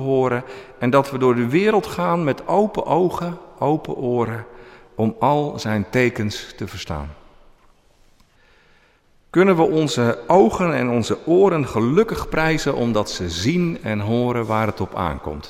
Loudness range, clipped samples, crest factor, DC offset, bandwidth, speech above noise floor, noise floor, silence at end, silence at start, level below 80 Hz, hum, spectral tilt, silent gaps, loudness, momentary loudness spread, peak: 7 LU; under 0.1%; 18 dB; under 0.1%; 15 kHz; 37 dB; -56 dBFS; 0 s; 0 s; -44 dBFS; none; -6.5 dB/octave; none; -20 LUFS; 12 LU; -2 dBFS